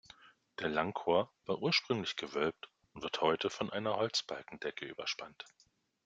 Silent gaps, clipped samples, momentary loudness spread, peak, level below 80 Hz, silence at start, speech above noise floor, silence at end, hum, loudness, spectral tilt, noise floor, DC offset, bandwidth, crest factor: none; under 0.1%; 17 LU; -14 dBFS; -74 dBFS; 0.25 s; 25 dB; 0.6 s; none; -36 LUFS; -4 dB/octave; -61 dBFS; under 0.1%; 9.2 kHz; 22 dB